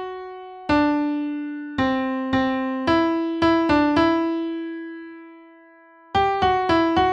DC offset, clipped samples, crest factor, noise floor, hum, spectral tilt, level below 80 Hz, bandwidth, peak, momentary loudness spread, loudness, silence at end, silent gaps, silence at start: under 0.1%; under 0.1%; 14 dB; -50 dBFS; none; -6.5 dB/octave; -46 dBFS; 7.8 kHz; -8 dBFS; 15 LU; -21 LUFS; 0 s; none; 0 s